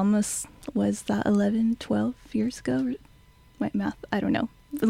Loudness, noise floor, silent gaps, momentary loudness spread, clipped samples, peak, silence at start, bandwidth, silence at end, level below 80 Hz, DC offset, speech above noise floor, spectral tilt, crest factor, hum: -27 LUFS; -55 dBFS; none; 9 LU; under 0.1%; -12 dBFS; 0 s; 15.5 kHz; 0 s; -54 dBFS; under 0.1%; 29 dB; -5.5 dB/octave; 16 dB; none